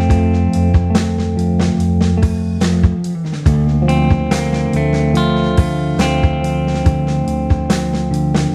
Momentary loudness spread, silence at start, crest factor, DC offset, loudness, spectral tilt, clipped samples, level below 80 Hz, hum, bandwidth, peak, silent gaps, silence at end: 4 LU; 0 s; 14 dB; under 0.1%; -15 LUFS; -7 dB/octave; under 0.1%; -22 dBFS; none; 12 kHz; 0 dBFS; none; 0 s